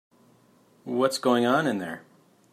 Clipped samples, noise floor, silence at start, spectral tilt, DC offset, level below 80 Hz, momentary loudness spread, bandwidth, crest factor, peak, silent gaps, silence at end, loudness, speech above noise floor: under 0.1%; -60 dBFS; 0.85 s; -5 dB/octave; under 0.1%; -76 dBFS; 18 LU; 15.5 kHz; 18 dB; -10 dBFS; none; 0.55 s; -25 LUFS; 36 dB